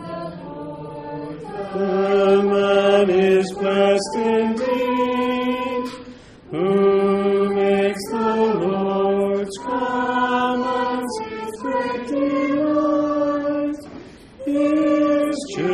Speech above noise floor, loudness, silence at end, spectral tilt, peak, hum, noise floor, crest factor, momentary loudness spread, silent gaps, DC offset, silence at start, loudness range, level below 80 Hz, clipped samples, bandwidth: 23 dB; -20 LUFS; 0 s; -6 dB/octave; -4 dBFS; none; -41 dBFS; 14 dB; 15 LU; none; under 0.1%; 0 s; 4 LU; -54 dBFS; under 0.1%; 13 kHz